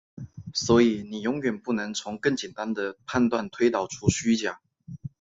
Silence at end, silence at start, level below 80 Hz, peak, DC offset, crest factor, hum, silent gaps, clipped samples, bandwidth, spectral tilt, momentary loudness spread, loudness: 0.15 s; 0.15 s; -52 dBFS; -6 dBFS; under 0.1%; 20 dB; none; none; under 0.1%; 7.8 kHz; -5 dB/octave; 20 LU; -26 LUFS